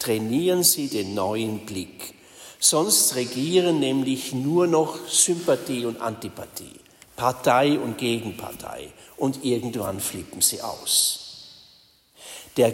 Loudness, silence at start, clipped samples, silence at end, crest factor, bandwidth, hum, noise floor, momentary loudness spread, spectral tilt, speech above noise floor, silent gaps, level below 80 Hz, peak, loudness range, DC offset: -22 LUFS; 0 s; under 0.1%; 0 s; 20 dB; 16.5 kHz; none; -56 dBFS; 18 LU; -3 dB/octave; 33 dB; none; -62 dBFS; -4 dBFS; 5 LU; under 0.1%